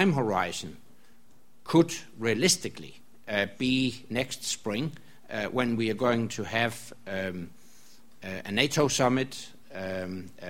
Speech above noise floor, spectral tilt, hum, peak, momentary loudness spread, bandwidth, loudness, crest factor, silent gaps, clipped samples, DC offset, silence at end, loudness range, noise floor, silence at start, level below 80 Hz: 35 dB; -4 dB/octave; none; -6 dBFS; 17 LU; 16.5 kHz; -28 LUFS; 24 dB; none; under 0.1%; 0.5%; 0 s; 3 LU; -63 dBFS; 0 s; -60 dBFS